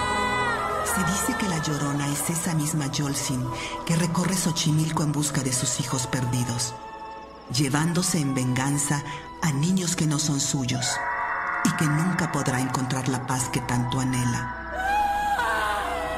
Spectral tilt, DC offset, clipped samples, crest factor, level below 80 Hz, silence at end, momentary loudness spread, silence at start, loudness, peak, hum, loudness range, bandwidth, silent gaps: -4 dB/octave; under 0.1%; under 0.1%; 16 dB; -48 dBFS; 0 s; 5 LU; 0 s; -25 LUFS; -8 dBFS; none; 1 LU; 16 kHz; none